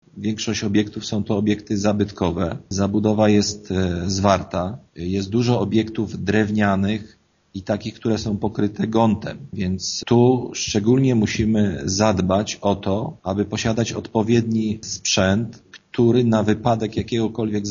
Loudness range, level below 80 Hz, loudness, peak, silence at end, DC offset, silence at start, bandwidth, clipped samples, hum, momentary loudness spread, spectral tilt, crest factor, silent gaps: 3 LU; -48 dBFS; -21 LUFS; 0 dBFS; 0 s; under 0.1%; 0.15 s; 7.4 kHz; under 0.1%; none; 9 LU; -6 dB/octave; 20 dB; none